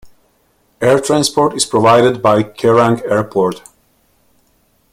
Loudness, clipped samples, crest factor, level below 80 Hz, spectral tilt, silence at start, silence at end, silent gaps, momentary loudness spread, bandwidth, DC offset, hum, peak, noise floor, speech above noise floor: -13 LUFS; under 0.1%; 14 dB; -50 dBFS; -4.5 dB/octave; 0.05 s; 1.35 s; none; 7 LU; 16 kHz; under 0.1%; none; 0 dBFS; -57 dBFS; 45 dB